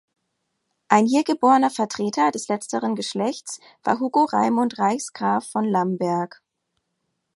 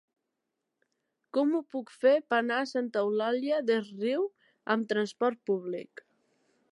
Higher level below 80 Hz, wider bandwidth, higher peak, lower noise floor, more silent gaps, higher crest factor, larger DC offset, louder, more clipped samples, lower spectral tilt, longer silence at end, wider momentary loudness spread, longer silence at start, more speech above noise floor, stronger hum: first, -72 dBFS vs -88 dBFS; about the same, 11.5 kHz vs 11 kHz; first, 0 dBFS vs -12 dBFS; second, -76 dBFS vs -84 dBFS; neither; about the same, 22 dB vs 18 dB; neither; first, -22 LUFS vs -30 LUFS; neither; about the same, -5 dB/octave vs -5.5 dB/octave; first, 1.1 s vs 0.9 s; about the same, 9 LU vs 11 LU; second, 0.9 s vs 1.35 s; about the same, 55 dB vs 55 dB; neither